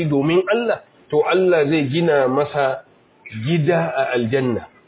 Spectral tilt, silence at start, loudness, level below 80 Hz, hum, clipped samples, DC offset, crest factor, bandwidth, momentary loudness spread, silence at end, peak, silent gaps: -11 dB/octave; 0 s; -19 LUFS; -56 dBFS; none; under 0.1%; under 0.1%; 14 dB; 4 kHz; 8 LU; 0.2 s; -6 dBFS; none